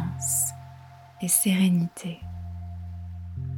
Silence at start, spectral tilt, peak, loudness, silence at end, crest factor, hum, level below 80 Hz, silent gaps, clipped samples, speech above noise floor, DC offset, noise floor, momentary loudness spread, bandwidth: 0 s; -4 dB/octave; -8 dBFS; -24 LUFS; 0 s; 20 dB; none; -50 dBFS; none; under 0.1%; 23 dB; under 0.1%; -47 dBFS; 17 LU; 19.5 kHz